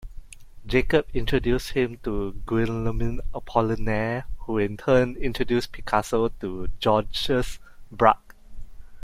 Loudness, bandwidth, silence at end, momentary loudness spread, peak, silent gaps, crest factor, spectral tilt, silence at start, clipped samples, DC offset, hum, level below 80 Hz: -25 LUFS; 15 kHz; 0.05 s; 9 LU; -2 dBFS; none; 22 dB; -6 dB/octave; 0 s; under 0.1%; under 0.1%; none; -34 dBFS